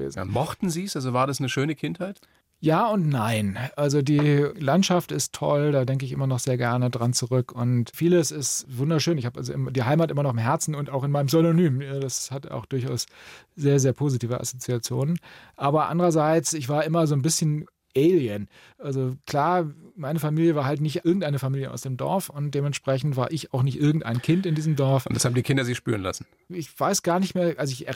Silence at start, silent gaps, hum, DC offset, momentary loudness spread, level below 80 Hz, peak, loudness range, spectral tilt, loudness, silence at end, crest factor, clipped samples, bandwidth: 0 s; none; none; under 0.1%; 9 LU; -60 dBFS; -12 dBFS; 3 LU; -5.5 dB/octave; -24 LUFS; 0 s; 12 dB; under 0.1%; 16.5 kHz